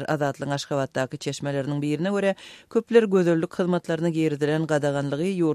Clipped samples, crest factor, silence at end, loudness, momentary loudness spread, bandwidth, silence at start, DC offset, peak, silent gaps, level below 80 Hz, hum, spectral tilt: under 0.1%; 20 dB; 0 s; -24 LUFS; 8 LU; 13.5 kHz; 0 s; under 0.1%; -4 dBFS; none; -66 dBFS; none; -6.5 dB/octave